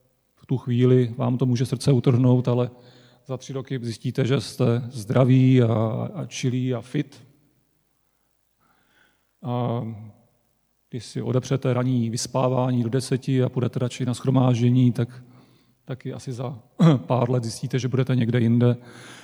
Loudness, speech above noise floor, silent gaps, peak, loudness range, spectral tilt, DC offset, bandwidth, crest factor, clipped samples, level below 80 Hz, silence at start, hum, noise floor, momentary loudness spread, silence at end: -23 LUFS; 47 dB; none; -4 dBFS; 11 LU; -7.5 dB/octave; under 0.1%; 12 kHz; 20 dB; under 0.1%; -66 dBFS; 0.5 s; none; -69 dBFS; 14 LU; 0.05 s